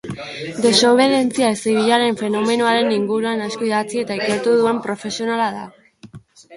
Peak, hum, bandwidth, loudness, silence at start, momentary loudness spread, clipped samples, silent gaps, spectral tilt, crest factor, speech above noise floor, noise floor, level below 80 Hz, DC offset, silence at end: 0 dBFS; none; 11.5 kHz; -18 LUFS; 0.05 s; 10 LU; under 0.1%; none; -4 dB/octave; 18 dB; 24 dB; -42 dBFS; -60 dBFS; under 0.1%; 0 s